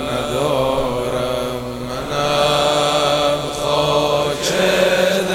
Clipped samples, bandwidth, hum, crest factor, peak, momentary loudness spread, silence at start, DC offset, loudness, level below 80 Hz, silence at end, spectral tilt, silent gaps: under 0.1%; over 20 kHz; none; 16 dB; -2 dBFS; 8 LU; 0 s; under 0.1%; -17 LUFS; -40 dBFS; 0 s; -4 dB/octave; none